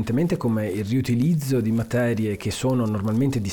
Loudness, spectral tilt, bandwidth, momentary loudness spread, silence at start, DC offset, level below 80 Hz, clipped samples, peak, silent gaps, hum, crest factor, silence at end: -23 LUFS; -7 dB/octave; 19.5 kHz; 4 LU; 0 s; 0.2%; -50 dBFS; under 0.1%; -12 dBFS; none; none; 10 dB; 0 s